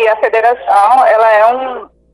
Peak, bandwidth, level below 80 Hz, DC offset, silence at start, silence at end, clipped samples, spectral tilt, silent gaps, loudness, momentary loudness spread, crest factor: 0 dBFS; 11.5 kHz; -54 dBFS; under 0.1%; 0 s; 0.3 s; under 0.1%; -2.5 dB/octave; none; -9 LUFS; 12 LU; 10 dB